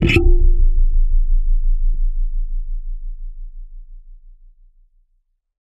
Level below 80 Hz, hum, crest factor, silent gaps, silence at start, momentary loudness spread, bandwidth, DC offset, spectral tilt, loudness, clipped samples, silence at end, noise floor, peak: -16 dBFS; none; 16 dB; none; 0 s; 21 LU; 5.6 kHz; under 0.1%; -7 dB/octave; -22 LUFS; under 0.1%; 1.55 s; -64 dBFS; 0 dBFS